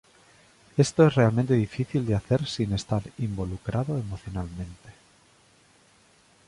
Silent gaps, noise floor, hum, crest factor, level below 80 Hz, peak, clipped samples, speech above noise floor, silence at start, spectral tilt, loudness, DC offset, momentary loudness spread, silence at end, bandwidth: none; -60 dBFS; none; 20 dB; -48 dBFS; -8 dBFS; under 0.1%; 34 dB; 0.75 s; -7 dB/octave; -26 LUFS; under 0.1%; 15 LU; 1.55 s; 11.5 kHz